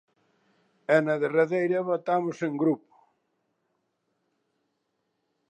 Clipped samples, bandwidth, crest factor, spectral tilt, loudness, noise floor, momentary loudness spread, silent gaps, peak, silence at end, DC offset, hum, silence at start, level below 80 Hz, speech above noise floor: under 0.1%; 9.6 kHz; 20 dB; -7.5 dB/octave; -26 LUFS; -78 dBFS; 6 LU; none; -8 dBFS; 2.75 s; under 0.1%; none; 0.9 s; -86 dBFS; 53 dB